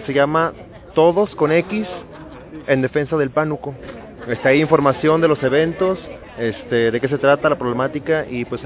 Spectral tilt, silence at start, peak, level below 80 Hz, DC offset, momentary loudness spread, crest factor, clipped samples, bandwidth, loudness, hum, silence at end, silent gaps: -10.5 dB/octave; 0 s; 0 dBFS; -48 dBFS; under 0.1%; 18 LU; 18 dB; under 0.1%; 4 kHz; -18 LUFS; none; 0 s; none